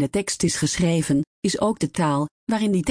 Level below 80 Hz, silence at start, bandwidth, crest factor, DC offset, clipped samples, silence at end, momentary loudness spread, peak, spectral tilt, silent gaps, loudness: -50 dBFS; 0 s; 10.5 kHz; 14 dB; under 0.1%; under 0.1%; 0 s; 4 LU; -10 dBFS; -5 dB/octave; 1.27-1.42 s, 2.31-2.47 s; -22 LUFS